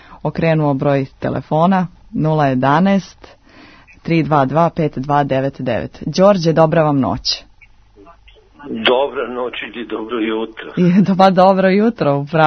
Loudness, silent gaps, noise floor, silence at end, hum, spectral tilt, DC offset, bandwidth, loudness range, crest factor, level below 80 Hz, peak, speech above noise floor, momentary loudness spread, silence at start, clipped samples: -15 LUFS; none; -46 dBFS; 0 s; none; -7 dB/octave; under 0.1%; 6.6 kHz; 5 LU; 16 dB; -46 dBFS; 0 dBFS; 32 dB; 12 LU; 0.1 s; under 0.1%